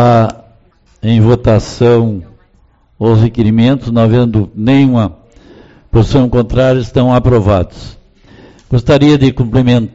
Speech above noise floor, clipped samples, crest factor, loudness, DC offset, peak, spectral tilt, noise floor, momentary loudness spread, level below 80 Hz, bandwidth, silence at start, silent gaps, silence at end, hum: 40 dB; under 0.1%; 10 dB; -10 LUFS; 0.5%; 0 dBFS; -7.5 dB/octave; -49 dBFS; 7 LU; -28 dBFS; 7.8 kHz; 0 s; none; 0.05 s; none